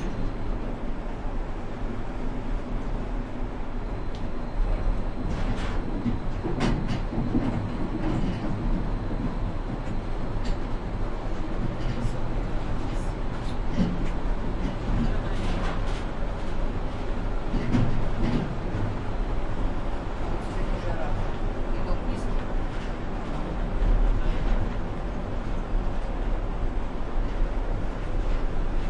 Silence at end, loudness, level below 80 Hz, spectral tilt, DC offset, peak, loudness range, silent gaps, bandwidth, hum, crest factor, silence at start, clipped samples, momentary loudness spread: 0 s; -31 LUFS; -28 dBFS; -7.5 dB/octave; under 0.1%; -10 dBFS; 4 LU; none; 8.2 kHz; none; 16 dB; 0 s; under 0.1%; 6 LU